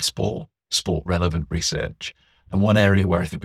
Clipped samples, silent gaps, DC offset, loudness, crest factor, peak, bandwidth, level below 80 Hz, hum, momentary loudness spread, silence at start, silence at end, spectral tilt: under 0.1%; none; under 0.1%; -22 LUFS; 20 dB; -2 dBFS; 14.5 kHz; -38 dBFS; none; 13 LU; 0 s; 0.05 s; -5 dB/octave